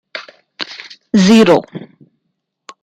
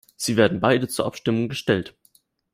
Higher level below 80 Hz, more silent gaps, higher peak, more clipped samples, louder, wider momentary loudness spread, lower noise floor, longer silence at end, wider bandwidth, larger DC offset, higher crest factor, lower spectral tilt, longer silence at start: about the same, -54 dBFS vs -58 dBFS; neither; about the same, -2 dBFS vs -4 dBFS; neither; first, -11 LUFS vs -22 LUFS; first, 24 LU vs 7 LU; first, -71 dBFS vs -61 dBFS; first, 1 s vs 0.65 s; second, 11 kHz vs 16 kHz; neither; second, 14 dB vs 20 dB; about the same, -5.5 dB/octave vs -5 dB/octave; about the same, 0.15 s vs 0.2 s